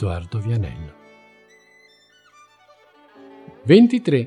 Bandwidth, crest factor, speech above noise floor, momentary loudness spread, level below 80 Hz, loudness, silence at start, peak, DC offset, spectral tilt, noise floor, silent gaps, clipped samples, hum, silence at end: 10 kHz; 20 dB; 37 dB; 22 LU; -46 dBFS; -18 LUFS; 0 s; -2 dBFS; under 0.1%; -8 dB/octave; -55 dBFS; none; under 0.1%; none; 0 s